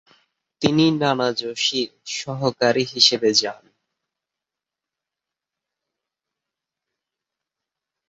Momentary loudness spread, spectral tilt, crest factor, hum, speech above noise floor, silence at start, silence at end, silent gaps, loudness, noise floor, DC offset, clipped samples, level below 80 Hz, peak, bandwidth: 12 LU; -3.5 dB/octave; 24 dB; none; 67 dB; 0.6 s; 4.55 s; none; -19 LUFS; -87 dBFS; under 0.1%; under 0.1%; -64 dBFS; 0 dBFS; 8 kHz